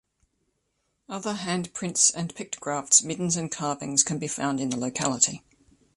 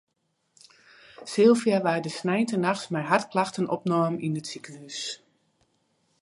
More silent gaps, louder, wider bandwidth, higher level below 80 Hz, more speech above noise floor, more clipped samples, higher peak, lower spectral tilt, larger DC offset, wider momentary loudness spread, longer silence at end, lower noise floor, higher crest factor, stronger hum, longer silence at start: neither; about the same, -25 LUFS vs -25 LUFS; about the same, 11.5 kHz vs 11.5 kHz; first, -66 dBFS vs -76 dBFS; about the same, 49 dB vs 49 dB; neither; about the same, -4 dBFS vs -6 dBFS; second, -2.5 dB/octave vs -5.5 dB/octave; neither; second, 14 LU vs 17 LU; second, 0.6 s vs 1.05 s; about the same, -75 dBFS vs -75 dBFS; about the same, 24 dB vs 22 dB; neither; about the same, 1.1 s vs 1.2 s